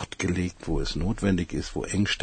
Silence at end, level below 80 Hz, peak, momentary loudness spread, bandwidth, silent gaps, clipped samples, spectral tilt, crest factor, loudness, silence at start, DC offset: 0 s; -36 dBFS; -10 dBFS; 5 LU; 9.4 kHz; none; under 0.1%; -5 dB/octave; 18 dB; -28 LUFS; 0 s; under 0.1%